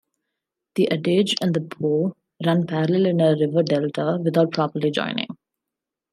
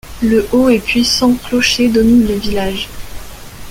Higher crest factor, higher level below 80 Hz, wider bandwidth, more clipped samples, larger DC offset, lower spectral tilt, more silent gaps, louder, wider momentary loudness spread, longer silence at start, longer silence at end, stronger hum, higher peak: about the same, 16 dB vs 12 dB; second, -70 dBFS vs -32 dBFS; second, 12.5 kHz vs 16.5 kHz; neither; neither; first, -6.5 dB/octave vs -4 dB/octave; neither; second, -22 LUFS vs -12 LUFS; second, 8 LU vs 21 LU; first, 0.75 s vs 0.05 s; first, 0.8 s vs 0 s; neither; second, -6 dBFS vs -2 dBFS